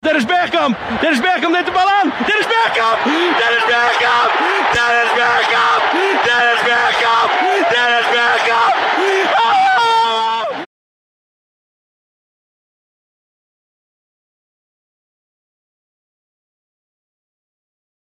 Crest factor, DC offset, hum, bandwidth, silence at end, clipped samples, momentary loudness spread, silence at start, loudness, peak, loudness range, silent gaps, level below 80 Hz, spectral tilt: 10 dB; under 0.1%; none; 14.5 kHz; 7.35 s; under 0.1%; 3 LU; 0.05 s; -13 LUFS; -6 dBFS; 5 LU; none; -56 dBFS; -2.5 dB/octave